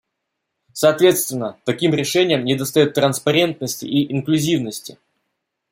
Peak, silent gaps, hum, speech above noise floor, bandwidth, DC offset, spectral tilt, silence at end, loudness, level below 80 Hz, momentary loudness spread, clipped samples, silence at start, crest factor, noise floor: -2 dBFS; none; none; 59 dB; 16.5 kHz; under 0.1%; -4.5 dB/octave; 0.8 s; -18 LUFS; -62 dBFS; 10 LU; under 0.1%; 0.75 s; 18 dB; -77 dBFS